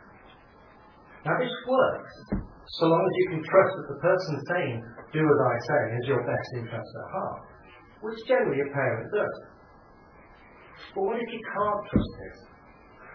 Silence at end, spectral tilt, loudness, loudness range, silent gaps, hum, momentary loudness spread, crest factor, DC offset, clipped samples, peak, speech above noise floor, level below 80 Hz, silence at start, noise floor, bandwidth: 0 s; -8 dB/octave; -27 LUFS; 7 LU; none; none; 15 LU; 22 dB; under 0.1%; under 0.1%; -6 dBFS; 27 dB; -50 dBFS; 1.1 s; -53 dBFS; 5.4 kHz